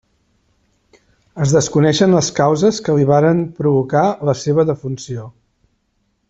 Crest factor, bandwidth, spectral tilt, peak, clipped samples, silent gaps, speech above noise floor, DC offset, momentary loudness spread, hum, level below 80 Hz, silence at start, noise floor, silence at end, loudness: 14 dB; 8 kHz; -6 dB/octave; -2 dBFS; under 0.1%; none; 51 dB; under 0.1%; 11 LU; none; -52 dBFS; 1.35 s; -66 dBFS; 1 s; -15 LUFS